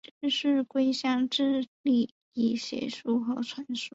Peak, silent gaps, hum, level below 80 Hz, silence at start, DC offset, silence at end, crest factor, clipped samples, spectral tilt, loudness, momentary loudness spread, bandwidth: -16 dBFS; 1.68-1.84 s, 2.11-2.32 s; none; -74 dBFS; 0.2 s; under 0.1%; 0.05 s; 14 dB; under 0.1%; -4 dB/octave; -29 LUFS; 8 LU; 8 kHz